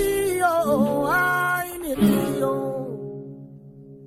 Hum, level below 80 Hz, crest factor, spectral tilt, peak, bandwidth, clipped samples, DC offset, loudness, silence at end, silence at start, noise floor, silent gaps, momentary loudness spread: none; -48 dBFS; 16 dB; -5.5 dB/octave; -8 dBFS; 16 kHz; under 0.1%; under 0.1%; -22 LUFS; 0 s; 0 s; -44 dBFS; none; 15 LU